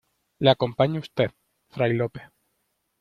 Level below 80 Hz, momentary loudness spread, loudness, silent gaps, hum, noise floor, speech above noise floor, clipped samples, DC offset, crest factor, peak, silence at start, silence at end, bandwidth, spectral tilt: -60 dBFS; 11 LU; -24 LUFS; none; none; -74 dBFS; 51 dB; under 0.1%; under 0.1%; 22 dB; -4 dBFS; 0.4 s; 0.75 s; 7 kHz; -8 dB/octave